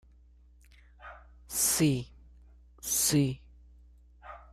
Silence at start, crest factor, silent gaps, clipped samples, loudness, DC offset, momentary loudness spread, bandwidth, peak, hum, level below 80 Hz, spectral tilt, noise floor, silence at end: 1 s; 20 dB; none; under 0.1%; -28 LUFS; under 0.1%; 25 LU; 15.5 kHz; -14 dBFS; 60 Hz at -55 dBFS; -54 dBFS; -3.5 dB/octave; -58 dBFS; 0.15 s